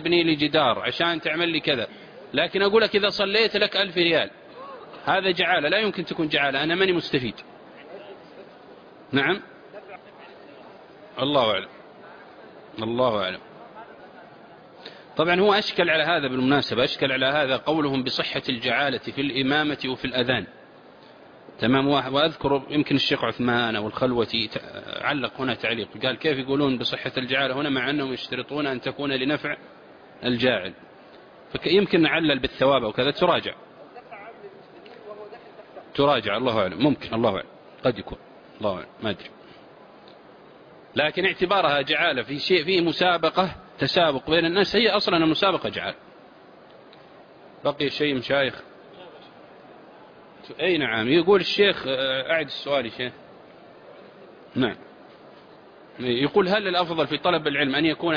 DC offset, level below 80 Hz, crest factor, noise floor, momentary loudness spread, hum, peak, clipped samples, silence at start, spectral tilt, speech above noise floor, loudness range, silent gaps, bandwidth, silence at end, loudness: under 0.1%; -58 dBFS; 18 dB; -49 dBFS; 20 LU; none; -8 dBFS; under 0.1%; 0 s; -6 dB/octave; 26 dB; 8 LU; none; 5.2 kHz; 0 s; -23 LUFS